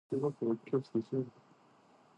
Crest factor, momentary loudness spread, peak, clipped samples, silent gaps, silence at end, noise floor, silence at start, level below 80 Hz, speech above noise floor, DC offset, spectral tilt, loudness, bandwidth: 16 dB; 5 LU; -20 dBFS; under 0.1%; none; 0.85 s; -65 dBFS; 0.1 s; -82 dBFS; 29 dB; under 0.1%; -9.5 dB/octave; -36 LUFS; 8.8 kHz